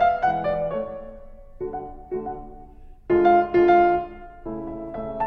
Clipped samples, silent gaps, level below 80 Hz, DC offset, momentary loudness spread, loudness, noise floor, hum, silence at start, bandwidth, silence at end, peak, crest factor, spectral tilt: under 0.1%; none; -44 dBFS; under 0.1%; 19 LU; -22 LUFS; -44 dBFS; none; 0 s; 5.4 kHz; 0 s; -6 dBFS; 16 dB; -8.5 dB/octave